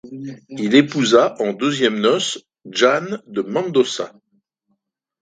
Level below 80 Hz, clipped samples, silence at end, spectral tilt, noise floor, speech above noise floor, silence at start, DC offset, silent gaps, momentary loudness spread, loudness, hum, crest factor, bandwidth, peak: -66 dBFS; under 0.1%; 1.15 s; -4 dB/octave; -71 dBFS; 53 dB; 0.05 s; under 0.1%; none; 16 LU; -18 LUFS; none; 18 dB; 9.4 kHz; 0 dBFS